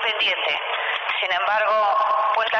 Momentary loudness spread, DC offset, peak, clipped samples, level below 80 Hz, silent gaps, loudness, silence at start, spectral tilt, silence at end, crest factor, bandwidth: 4 LU; under 0.1%; -12 dBFS; under 0.1%; -70 dBFS; none; -20 LUFS; 0 s; -1 dB/octave; 0 s; 10 dB; 6.8 kHz